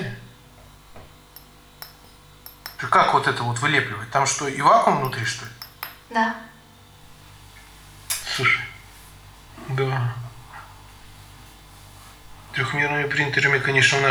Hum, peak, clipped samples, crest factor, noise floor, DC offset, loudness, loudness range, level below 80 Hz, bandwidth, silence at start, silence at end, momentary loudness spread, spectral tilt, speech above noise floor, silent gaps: 50 Hz at -55 dBFS; -2 dBFS; under 0.1%; 24 dB; -49 dBFS; under 0.1%; -21 LUFS; 10 LU; -52 dBFS; over 20 kHz; 0 s; 0 s; 25 LU; -3.5 dB/octave; 28 dB; none